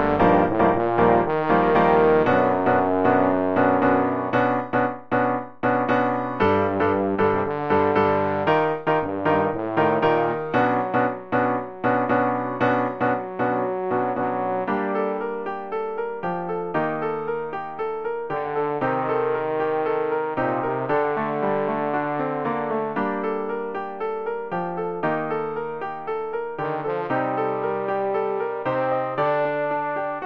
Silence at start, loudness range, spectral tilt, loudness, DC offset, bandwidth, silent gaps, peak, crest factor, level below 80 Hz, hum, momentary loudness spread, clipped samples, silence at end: 0 s; 7 LU; -9 dB/octave; -23 LUFS; under 0.1%; 6 kHz; none; -4 dBFS; 18 dB; -54 dBFS; none; 9 LU; under 0.1%; 0 s